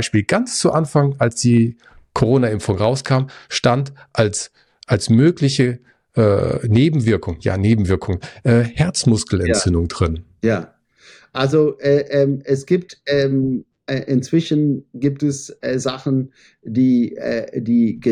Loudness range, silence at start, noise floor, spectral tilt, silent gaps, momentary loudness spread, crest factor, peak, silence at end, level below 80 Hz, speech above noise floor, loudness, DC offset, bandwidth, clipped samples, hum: 3 LU; 0 s; -49 dBFS; -6 dB/octave; none; 8 LU; 14 dB; -4 dBFS; 0 s; -44 dBFS; 32 dB; -18 LUFS; under 0.1%; 11.5 kHz; under 0.1%; none